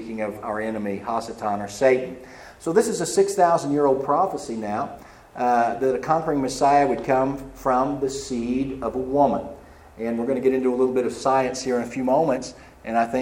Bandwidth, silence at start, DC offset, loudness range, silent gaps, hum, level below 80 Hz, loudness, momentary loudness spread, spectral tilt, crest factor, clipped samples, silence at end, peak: 16.5 kHz; 0 s; under 0.1%; 2 LU; none; none; -52 dBFS; -23 LUFS; 10 LU; -5 dB/octave; 18 dB; under 0.1%; 0 s; -4 dBFS